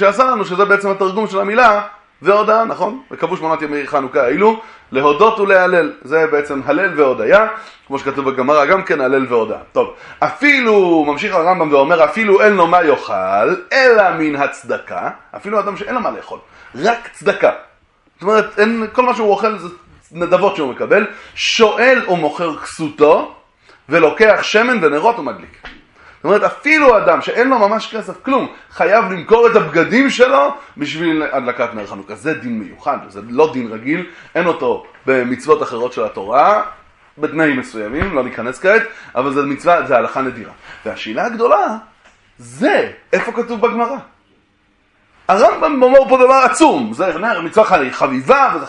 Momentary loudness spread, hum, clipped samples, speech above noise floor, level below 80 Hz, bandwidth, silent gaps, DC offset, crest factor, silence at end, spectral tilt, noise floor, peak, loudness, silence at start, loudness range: 13 LU; none; under 0.1%; 43 dB; -48 dBFS; 11 kHz; none; under 0.1%; 14 dB; 0 s; -5 dB/octave; -57 dBFS; 0 dBFS; -14 LUFS; 0 s; 6 LU